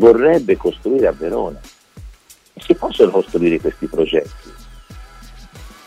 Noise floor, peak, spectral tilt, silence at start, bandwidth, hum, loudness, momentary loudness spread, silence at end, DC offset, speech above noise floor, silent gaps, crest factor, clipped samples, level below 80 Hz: -43 dBFS; 0 dBFS; -6.5 dB/octave; 0 s; 13.5 kHz; none; -16 LUFS; 12 LU; 0.2 s; under 0.1%; 29 dB; none; 16 dB; under 0.1%; -40 dBFS